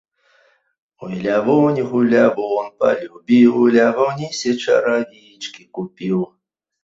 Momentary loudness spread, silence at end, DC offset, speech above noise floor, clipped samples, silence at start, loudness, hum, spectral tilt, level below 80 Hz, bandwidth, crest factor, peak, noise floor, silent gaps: 17 LU; 0.6 s; under 0.1%; 41 dB; under 0.1%; 1 s; -17 LUFS; none; -6 dB/octave; -62 dBFS; 7.8 kHz; 16 dB; -2 dBFS; -58 dBFS; none